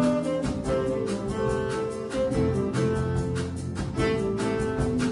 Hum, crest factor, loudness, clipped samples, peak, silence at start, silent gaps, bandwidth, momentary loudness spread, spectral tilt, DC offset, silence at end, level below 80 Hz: none; 14 dB; -27 LUFS; under 0.1%; -12 dBFS; 0 s; none; 11 kHz; 5 LU; -6.5 dB/octave; under 0.1%; 0 s; -42 dBFS